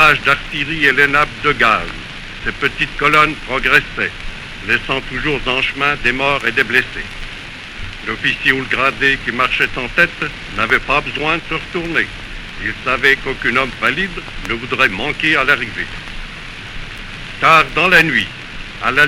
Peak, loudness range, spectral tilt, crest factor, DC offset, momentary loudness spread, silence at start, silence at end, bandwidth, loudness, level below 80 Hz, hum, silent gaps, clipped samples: 0 dBFS; 3 LU; -4 dB/octave; 16 dB; under 0.1%; 18 LU; 0 s; 0 s; 16.5 kHz; -15 LUFS; -34 dBFS; none; none; under 0.1%